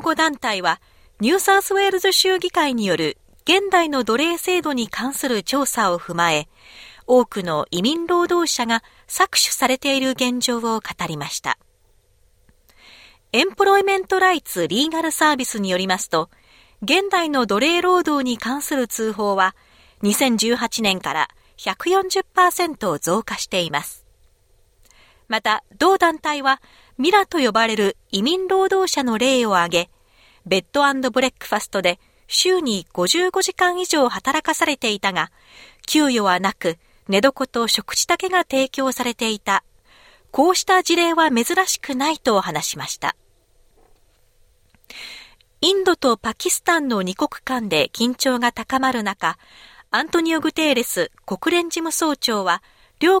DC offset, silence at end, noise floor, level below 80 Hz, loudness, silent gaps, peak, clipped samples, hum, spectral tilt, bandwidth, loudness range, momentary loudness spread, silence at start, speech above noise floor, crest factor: under 0.1%; 0 s; -58 dBFS; -56 dBFS; -19 LUFS; none; -2 dBFS; under 0.1%; none; -2.5 dB/octave; 17 kHz; 4 LU; 8 LU; 0 s; 38 dB; 18 dB